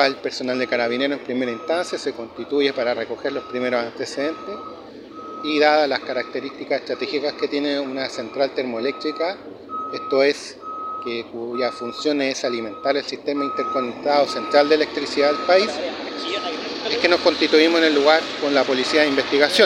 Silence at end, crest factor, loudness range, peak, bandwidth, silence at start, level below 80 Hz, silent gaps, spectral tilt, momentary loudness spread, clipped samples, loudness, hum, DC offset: 0 s; 20 dB; 6 LU; -2 dBFS; 13 kHz; 0 s; -64 dBFS; none; -3 dB/octave; 12 LU; under 0.1%; -21 LUFS; none; under 0.1%